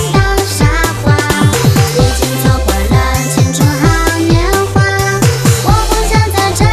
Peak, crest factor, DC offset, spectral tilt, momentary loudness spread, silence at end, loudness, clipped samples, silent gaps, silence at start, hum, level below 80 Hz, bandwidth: 0 dBFS; 10 dB; under 0.1%; -5 dB/octave; 2 LU; 0 s; -11 LUFS; under 0.1%; none; 0 s; none; -18 dBFS; 14.5 kHz